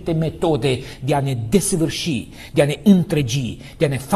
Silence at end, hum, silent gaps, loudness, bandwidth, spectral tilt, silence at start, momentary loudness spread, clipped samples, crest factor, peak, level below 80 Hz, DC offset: 0 s; none; none; -19 LUFS; 14 kHz; -5.5 dB/octave; 0 s; 9 LU; under 0.1%; 18 dB; -2 dBFS; -40 dBFS; under 0.1%